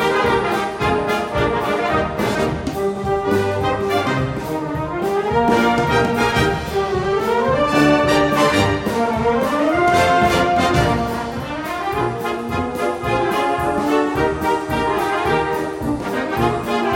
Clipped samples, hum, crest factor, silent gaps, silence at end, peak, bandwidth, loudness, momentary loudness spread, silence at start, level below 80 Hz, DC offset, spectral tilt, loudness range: under 0.1%; none; 16 dB; none; 0 s; -2 dBFS; 16.5 kHz; -18 LUFS; 8 LU; 0 s; -36 dBFS; under 0.1%; -5.5 dB/octave; 4 LU